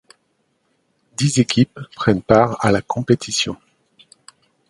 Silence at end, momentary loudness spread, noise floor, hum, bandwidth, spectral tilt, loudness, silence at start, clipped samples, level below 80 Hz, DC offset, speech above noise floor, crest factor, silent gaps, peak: 1.15 s; 8 LU; -67 dBFS; none; 11.5 kHz; -5 dB/octave; -18 LUFS; 1.2 s; under 0.1%; -48 dBFS; under 0.1%; 50 dB; 20 dB; none; 0 dBFS